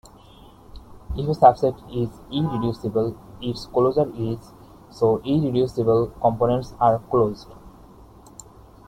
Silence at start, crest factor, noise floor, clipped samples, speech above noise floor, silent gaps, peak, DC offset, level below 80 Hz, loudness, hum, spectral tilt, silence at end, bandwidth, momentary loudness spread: 0.75 s; 22 dB; -48 dBFS; under 0.1%; 26 dB; none; -2 dBFS; under 0.1%; -44 dBFS; -22 LUFS; none; -8 dB/octave; 1.2 s; 15.5 kHz; 13 LU